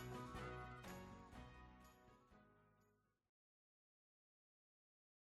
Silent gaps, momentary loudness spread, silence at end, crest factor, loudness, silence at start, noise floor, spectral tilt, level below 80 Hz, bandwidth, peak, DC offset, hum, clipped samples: none; 13 LU; 2.3 s; 18 dB; -56 LUFS; 0 s; -82 dBFS; -5.5 dB/octave; -70 dBFS; 13 kHz; -42 dBFS; under 0.1%; none; under 0.1%